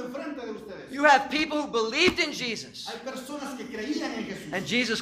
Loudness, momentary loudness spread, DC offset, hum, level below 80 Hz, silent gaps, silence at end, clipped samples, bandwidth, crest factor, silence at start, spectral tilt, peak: -27 LUFS; 16 LU; under 0.1%; none; -60 dBFS; none; 0 s; under 0.1%; 15.5 kHz; 20 dB; 0 s; -3 dB/octave; -6 dBFS